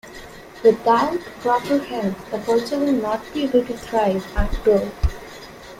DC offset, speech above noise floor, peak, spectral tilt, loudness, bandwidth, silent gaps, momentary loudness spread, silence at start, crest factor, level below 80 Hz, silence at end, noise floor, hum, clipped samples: under 0.1%; 19 dB; -4 dBFS; -6 dB/octave; -21 LUFS; 16 kHz; none; 16 LU; 0.05 s; 18 dB; -32 dBFS; 0 s; -39 dBFS; none; under 0.1%